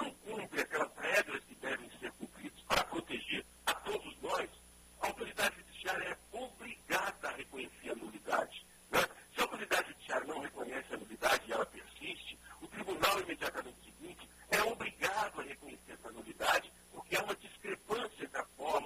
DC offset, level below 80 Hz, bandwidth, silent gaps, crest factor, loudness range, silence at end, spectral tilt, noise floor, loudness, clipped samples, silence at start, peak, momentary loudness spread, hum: under 0.1%; -66 dBFS; 15.5 kHz; none; 24 dB; 2 LU; 0 s; -2 dB/octave; -59 dBFS; -38 LUFS; under 0.1%; 0 s; -16 dBFS; 16 LU; none